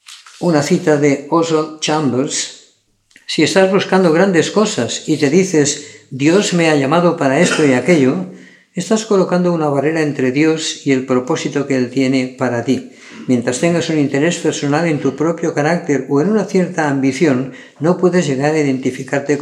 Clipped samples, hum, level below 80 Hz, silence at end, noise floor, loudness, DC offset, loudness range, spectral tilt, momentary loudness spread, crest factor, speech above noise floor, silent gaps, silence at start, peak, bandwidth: under 0.1%; none; -68 dBFS; 0 s; -56 dBFS; -15 LUFS; under 0.1%; 3 LU; -5 dB/octave; 7 LU; 14 dB; 41 dB; none; 0.1 s; 0 dBFS; 12.5 kHz